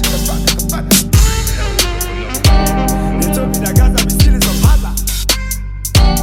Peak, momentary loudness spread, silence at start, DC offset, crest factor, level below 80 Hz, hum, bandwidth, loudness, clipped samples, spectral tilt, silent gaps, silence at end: 0 dBFS; 6 LU; 0 s; under 0.1%; 12 dB; -16 dBFS; none; 18 kHz; -13 LUFS; under 0.1%; -4 dB/octave; none; 0 s